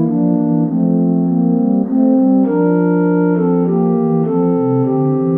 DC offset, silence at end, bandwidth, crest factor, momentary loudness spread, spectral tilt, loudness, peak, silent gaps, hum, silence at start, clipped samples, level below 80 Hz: 0.2%; 0 s; 2.5 kHz; 12 dB; 2 LU; -13.5 dB/octave; -14 LUFS; -2 dBFS; none; none; 0 s; under 0.1%; -68 dBFS